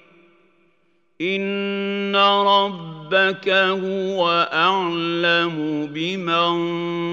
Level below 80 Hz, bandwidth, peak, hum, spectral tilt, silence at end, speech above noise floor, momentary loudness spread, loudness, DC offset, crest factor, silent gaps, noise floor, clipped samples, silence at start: -78 dBFS; 7.6 kHz; -4 dBFS; none; -5.5 dB/octave; 0 s; 46 dB; 8 LU; -19 LUFS; under 0.1%; 18 dB; none; -65 dBFS; under 0.1%; 1.2 s